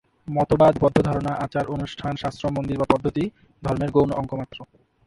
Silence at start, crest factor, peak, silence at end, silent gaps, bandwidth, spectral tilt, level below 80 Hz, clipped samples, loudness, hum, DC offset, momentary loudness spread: 0.25 s; 22 dB; 0 dBFS; 0.4 s; none; 11.5 kHz; -8 dB/octave; -44 dBFS; under 0.1%; -23 LUFS; none; under 0.1%; 13 LU